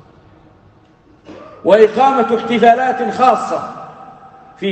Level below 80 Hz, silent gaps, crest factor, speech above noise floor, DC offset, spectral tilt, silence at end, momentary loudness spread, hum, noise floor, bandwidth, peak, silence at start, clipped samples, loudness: -58 dBFS; none; 16 dB; 36 dB; under 0.1%; -5.5 dB/octave; 0 s; 16 LU; none; -48 dBFS; 8.8 kHz; 0 dBFS; 1.3 s; under 0.1%; -13 LUFS